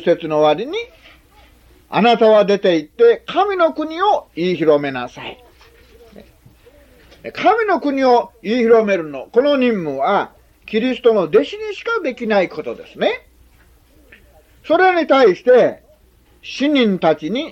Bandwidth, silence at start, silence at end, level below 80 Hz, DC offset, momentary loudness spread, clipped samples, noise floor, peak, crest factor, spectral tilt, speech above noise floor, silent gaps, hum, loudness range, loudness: 7.6 kHz; 0 s; 0 s; -54 dBFS; under 0.1%; 14 LU; under 0.1%; -52 dBFS; -2 dBFS; 14 dB; -6 dB/octave; 36 dB; none; none; 6 LU; -16 LUFS